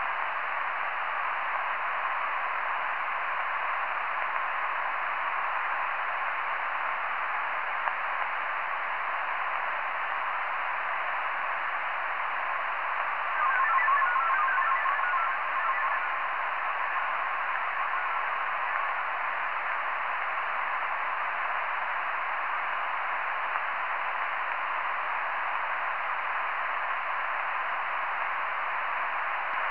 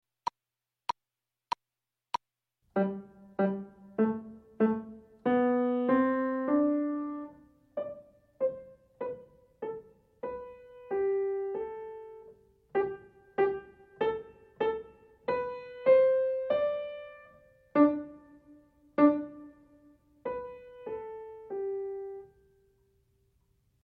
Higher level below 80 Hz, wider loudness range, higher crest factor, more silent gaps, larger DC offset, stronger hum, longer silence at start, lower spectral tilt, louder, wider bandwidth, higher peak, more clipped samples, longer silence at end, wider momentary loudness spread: second, -80 dBFS vs -68 dBFS; second, 4 LU vs 11 LU; about the same, 20 dB vs 22 dB; neither; first, 0.7% vs under 0.1%; neither; second, 0 s vs 2.75 s; second, -3.5 dB/octave vs -8 dB/octave; first, -29 LUFS vs -32 LUFS; second, 5.4 kHz vs 6.2 kHz; about the same, -10 dBFS vs -12 dBFS; neither; second, 0 s vs 1.6 s; second, 4 LU vs 20 LU